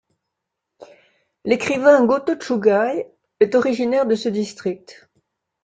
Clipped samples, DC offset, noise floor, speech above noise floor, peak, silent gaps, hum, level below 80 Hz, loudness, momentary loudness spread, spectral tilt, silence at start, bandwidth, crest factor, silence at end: under 0.1%; under 0.1%; -80 dBFS; 62 dB; -2 dBFS; none; none; -64 dBFS; -19 LUFS; 14 LU; -5.5 dB/octave; 0.8 s; 9.2 kHz; 18 dB; 0.7 s